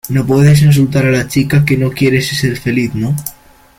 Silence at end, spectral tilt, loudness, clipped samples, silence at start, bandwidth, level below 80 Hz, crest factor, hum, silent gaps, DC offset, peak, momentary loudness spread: 0.45 s; -6.5 dB/octave; -12 LUFS; under 0.1%; 0.05 s; 17 kHz; -38 dBFS; 12 dB; none; none; under 0.1%; 0 dBFS; 9 LU